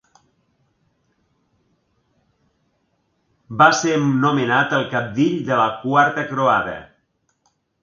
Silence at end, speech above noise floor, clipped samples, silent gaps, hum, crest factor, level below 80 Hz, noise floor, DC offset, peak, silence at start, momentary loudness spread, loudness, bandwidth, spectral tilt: 1 s; 50 dB; under 0.1%; none; none; 22 dB; -60 dBFS; -68 dBFS; under 0.1%; 0 dBFS; 3.5 s; 8 LU; -18 LUFS; 7.4 kHz; -5 dB/octave